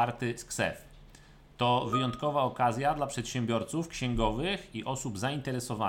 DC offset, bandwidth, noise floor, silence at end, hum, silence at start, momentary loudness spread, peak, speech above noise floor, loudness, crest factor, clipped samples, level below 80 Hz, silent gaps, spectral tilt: under 0.1%; 17 kHz; -55 dBFS; 0 s; none; 0 s; 7 LU; -14 dBFS; 24 dB; -31 LUFS; 18 dB; under 0.1%; -48 dBFS; none; -5 dB/octave